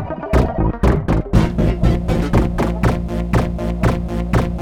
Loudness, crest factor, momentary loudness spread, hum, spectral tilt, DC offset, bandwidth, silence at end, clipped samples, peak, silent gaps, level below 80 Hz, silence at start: -18 LUFS; 16 dB; 3 LU; none; -8 dB/octave; under 0.1%; 13.5 kHz; 0 s; under 0.1%; -2 dBFS; none; -22 dBFS; 0 s